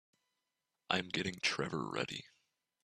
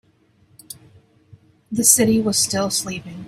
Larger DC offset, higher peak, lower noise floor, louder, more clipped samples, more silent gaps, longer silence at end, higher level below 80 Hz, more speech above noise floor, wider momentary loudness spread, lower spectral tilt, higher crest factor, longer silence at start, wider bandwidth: neither; second, -14 dBFS vs 0 dBFS; first, -88 dBFS vs -58 dBFS; second, -37 LUFS vs -17 LUFS; neither; neither; first, 0.55 s vs 0 s; second, -74 dBFS vs -56 dBFS; first, 50 dB vs 39 dB; second, 6 LU vs 26 LU; about the same, -3.5 dB/octave vs -3 dB/octave; about the same, 26 dB vs 22 dB; first, 0.9 s vs 0.7 s; second, 13 kHz vs 16 kHz